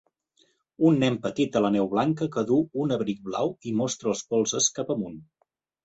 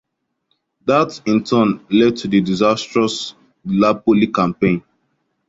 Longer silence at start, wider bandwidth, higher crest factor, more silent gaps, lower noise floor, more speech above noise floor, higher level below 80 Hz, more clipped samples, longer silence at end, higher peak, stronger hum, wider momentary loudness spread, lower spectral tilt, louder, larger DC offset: about the same, 0.8 s vs 0.85 s; about the same, 8.2 kHz vs 7.8 kHz; about the same, 18 dB vs 16 dB; neither; about the same, -67 dBFS vs -69 dBFS; second, 42 dB vs 53 dB; second, -64 dBFS vs -52 dBFS; neither; about the same, 0.6 s vs 0.7 s; second, -8 dBFS vs -2 dBFS; neither; about the same, 7 LU vs 8 LU; about the same, -5 dB/octave vs -6 dB/octave; second, -25 LUFS vs -17 LUFS; neither